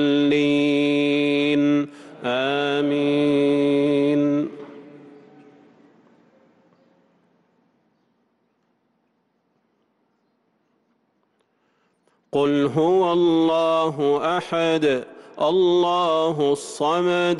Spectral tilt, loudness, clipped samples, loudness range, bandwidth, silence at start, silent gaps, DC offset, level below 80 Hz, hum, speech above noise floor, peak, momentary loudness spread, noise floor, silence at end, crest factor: -6 dB/octave; -20 LUFS; under 0.1%; 7 LU; 11.5 kHz; 0 s; none; under 0.1%; -68 dBFS; none; 50 dB; -10 dBFS; 7 LU; -69 dBFS; 0 s; 12 dB